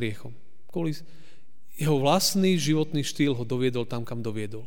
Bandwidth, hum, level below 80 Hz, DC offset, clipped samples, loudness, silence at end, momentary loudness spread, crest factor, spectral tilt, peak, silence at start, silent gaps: 18 kHz; none; -64 dBFS; 2%; under 0.1%; -26 LUFS; 0 s; 13 LU; 20 dB; -5 dB/octave; -8 dBFS; 0 s; none